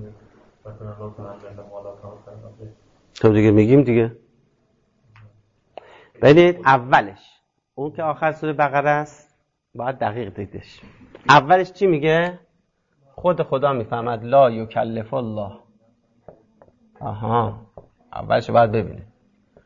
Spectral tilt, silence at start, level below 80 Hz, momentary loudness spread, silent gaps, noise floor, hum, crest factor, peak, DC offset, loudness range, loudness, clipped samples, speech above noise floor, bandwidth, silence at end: -7.5 dB/octave; 0 s; -52 dBFS; 24 LU; none; -67 dBFS; none; 20 dB; -2 dBFS; under 0.1%; 6 LU; -18 LUFS; under 0.1%; 48 dB; 7.6 kHz; 0.6 s